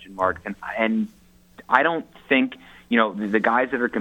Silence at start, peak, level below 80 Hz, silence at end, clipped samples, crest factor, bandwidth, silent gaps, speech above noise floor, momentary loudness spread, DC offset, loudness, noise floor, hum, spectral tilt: 0 s; 0 dBFS; -60 dBFS; 0 s; under 0.1%; 22 dB; 17 kHz; none; 27 dB; 11 LU; under 0.1%; -22 LUFS; -50 dBFS; none; -6.5 dB/octave